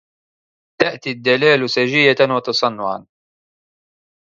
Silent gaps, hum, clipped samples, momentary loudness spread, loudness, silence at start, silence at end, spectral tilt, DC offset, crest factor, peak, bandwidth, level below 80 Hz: none; none; under 0.1%; 10 LU; -16 LUFS; 0.8 s; 1.25 s; -4.5 dB/octave; under 0.1%; 18 dB; 0 dBFS; 7.4 kHz; -64 dBFS